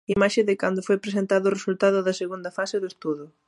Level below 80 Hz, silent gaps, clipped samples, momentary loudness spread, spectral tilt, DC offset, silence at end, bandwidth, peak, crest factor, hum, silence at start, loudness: -60 dBFS; none; under 0.1%; 9 LU; -5.5 dB/octave; under 0.1%; 0.2 s; 11.5 kHz; -6 dBFS; 18 dB; none; 0.1 s; -24 LUFS